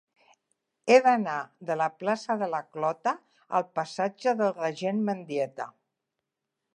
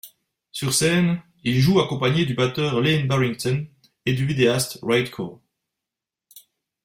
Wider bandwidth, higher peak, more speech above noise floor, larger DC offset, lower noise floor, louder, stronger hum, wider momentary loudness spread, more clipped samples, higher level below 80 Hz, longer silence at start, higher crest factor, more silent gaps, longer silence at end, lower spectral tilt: second, 9.8 kHz vs 16.5 kHz; about the same, -6 dBFS vs -4 dBFS; second, 58 dB vs 66 dB; neither; about the same, -85 dBFS vs -87 dBFS; second, -28 LUFS vs -21 LUFS; neither; about the same, 13 LU vs 11 LU; neither; second, -86 dBFS vs -54 dBFS; first, 0.85 s vs 0.05 s; about the same, 22 dB vs 18 dB; neither; first, 1.05 s vs 0.45 s; about the same, -5.5 dB/octave vs -5 dB/octave